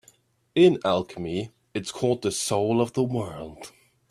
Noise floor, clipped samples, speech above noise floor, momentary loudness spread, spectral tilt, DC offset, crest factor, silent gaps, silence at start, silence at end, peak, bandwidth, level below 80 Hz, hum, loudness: -60 dBFS; under 0.1%; 36 dB; 18 LU; -5.5 dB/octave; under 0.1%; 20 dB; none; 0.55 s; 0.4 s; -6 dBFS; 14 kHz; -60 dBFS; none; -25 LUFS